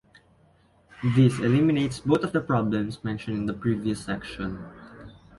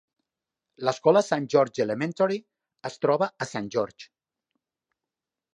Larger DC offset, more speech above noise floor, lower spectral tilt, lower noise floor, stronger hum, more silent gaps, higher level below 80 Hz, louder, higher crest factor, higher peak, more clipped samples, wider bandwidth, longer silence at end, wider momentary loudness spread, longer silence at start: neither; second, 36 dB vs 64 dB; first, -7.5 dB/octave vs -5.5 dB/octave; second, -60 dBFS vs -89 dBFS; neither; neither; first, -52 dBFS vs -74 dBFS; about the same, -25 LUFS vs -25 LUFS; about the same, 18 dB vs 22 dB; about the same, -8 dBFS vs -6 dBFS; neither; about the same, 11.5 kHz vs 10.5 kHz; second, 0.3 s vs 1.5 s; about the same, 13 LU vs 13 LU; first, 1 s vs 0.8 s